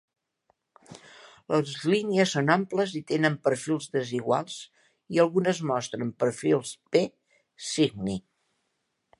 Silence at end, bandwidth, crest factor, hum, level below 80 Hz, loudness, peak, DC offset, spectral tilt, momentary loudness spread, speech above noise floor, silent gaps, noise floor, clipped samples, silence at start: 1 s; 11.5 kHz; 22 dB; none; -68 dBFS; -27 LUFS; -6 dBFS; under 0.1%; -5 dB/octave; 10 LU; 52 dB; none; -78 dBFS; under 0.1%; 0.9 s